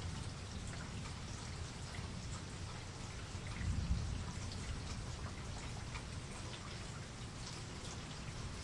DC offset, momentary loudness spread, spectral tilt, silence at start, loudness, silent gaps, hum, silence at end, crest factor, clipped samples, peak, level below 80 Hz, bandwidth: under 0.1%; 6 LU; -4.5 dB/octave; 0 s; -46 LUFS; none; none; 0 s; 20 dB; under 0.1%; -24 dBFS; -50 dBFS; 11.5 kHz